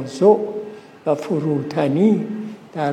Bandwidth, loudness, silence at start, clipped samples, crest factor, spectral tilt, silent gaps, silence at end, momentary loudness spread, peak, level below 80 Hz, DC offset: 10 kHz; -19 LUFS; 0 s; under 0.1%; 18 dB; -8 dB/octave; none; 0 s; 15 LU; 0 dBFS; -70 dBFS; under 0.1%